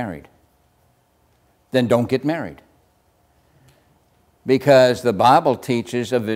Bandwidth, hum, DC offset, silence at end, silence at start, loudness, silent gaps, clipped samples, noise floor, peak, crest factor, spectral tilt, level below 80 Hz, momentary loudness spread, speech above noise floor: 16 kHz; none; under 0.1%; 0 s; 0 s; -18 LUFS; none; under 0.1%; -61 dBFS; -2 dBFS; 20 dB; -6 dB/octave; -58 dBFS; 17 LU; 43 dB